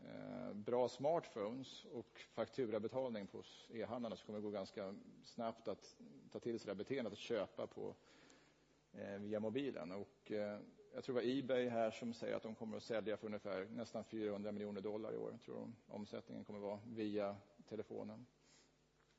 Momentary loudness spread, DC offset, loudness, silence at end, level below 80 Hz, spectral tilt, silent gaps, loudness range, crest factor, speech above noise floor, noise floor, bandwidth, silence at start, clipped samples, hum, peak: 13 LU; under 0.1%; -46 LUFS; 0.6 s; -84 dBFS; -5 dB/octave; none; 5 LU; 20 dB; 30 dB; -76 dBFS; 7.6 kHz; 0 s; under 0.1%; none; -26 dBFS